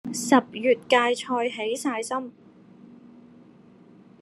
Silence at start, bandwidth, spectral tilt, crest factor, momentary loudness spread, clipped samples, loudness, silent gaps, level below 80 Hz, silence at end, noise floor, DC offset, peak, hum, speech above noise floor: 0.05 s; 13 kHz; -3 dB/octave; 22 dB; 10 LU; under 0.1%; -24 LUFS; none; -74 dBFS; 1.25 s; -52 dBFS; under 0.1%; -4 dBFS; none; 28 dB